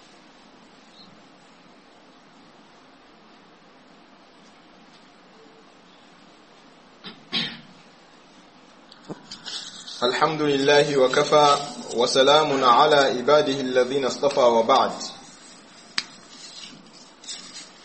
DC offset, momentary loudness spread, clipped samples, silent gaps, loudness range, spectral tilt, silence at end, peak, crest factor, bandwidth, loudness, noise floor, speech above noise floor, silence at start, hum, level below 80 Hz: under 0.1%; 24 LU; under 0.1%; none; 17 LU; -3.5 dB/octave; 0.2 s; -2 dBFS; 22 dB; 8.8 kHz; -20 LUFS; -51 dBFS; 32 dB; 7.05 s; none; -68 dBFS